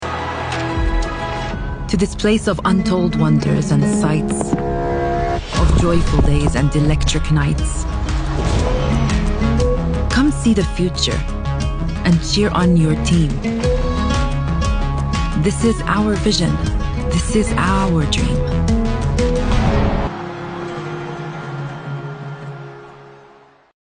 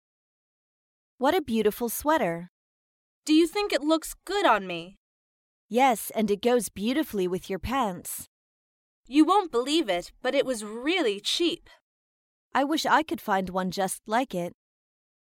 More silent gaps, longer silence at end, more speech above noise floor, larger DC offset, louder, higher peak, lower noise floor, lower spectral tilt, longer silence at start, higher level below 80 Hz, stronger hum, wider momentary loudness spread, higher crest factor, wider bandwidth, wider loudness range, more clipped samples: second, none vs 2.49-3.22 s, 4.97-5.69 s, 8.27-9.04 s, 11.81-12.51 s; about the same, 0.65 s vs 0.75 s; second, 32 dB vs over 64 dB; neither; first, -18 LUFS vs -26 LUFS; first, -2 dBFS vs -8 dBFS; second, -47 dBFS vs under -90 dBFS; first, -6 dB/octave vs -4 dB/octave; second, 0 s vs 1.2 s; first, -22 dBFS vs -56 dBFS; neither; about the same, 11 LU vs 9 LU; about the same, 14 dB vs 18 dB; second, 10.5 kHz vs 17 kHz; about the same, 4 LU vs 2 LU; neither